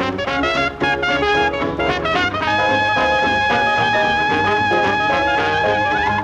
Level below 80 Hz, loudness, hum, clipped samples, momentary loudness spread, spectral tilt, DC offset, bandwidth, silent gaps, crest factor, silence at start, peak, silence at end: -40 dBFS; -16 LUFS; none; under 0.1%; 3 LU; -4.5 dB/octave; under 0.1%; 9.8 kHz; none; 12 dB; 0 s; -4 dBFS; 0 s